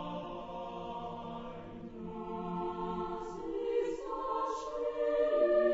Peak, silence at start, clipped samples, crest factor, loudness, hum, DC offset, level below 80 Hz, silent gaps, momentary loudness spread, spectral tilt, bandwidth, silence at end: -18 dBFS; 0 s; under 0.1%; 16 dB; -36 LUFS; none; under 0.1%; -58 dBFS; none; 14 LU; -6.5 dB/octave; 8 kHz; 0 s